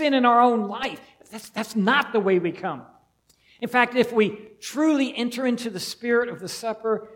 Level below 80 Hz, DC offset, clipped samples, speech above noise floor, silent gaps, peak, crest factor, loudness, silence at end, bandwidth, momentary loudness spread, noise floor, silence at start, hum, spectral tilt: -68 dBFS; under 0.1%; under 0.1%; 40 dB; none; -4 dBFS; 20 dB; -23 LUFS; 0 s; 17.5 kHz; 16 LU; -63 dBFS; 0 s; none; -4.5 dB/octave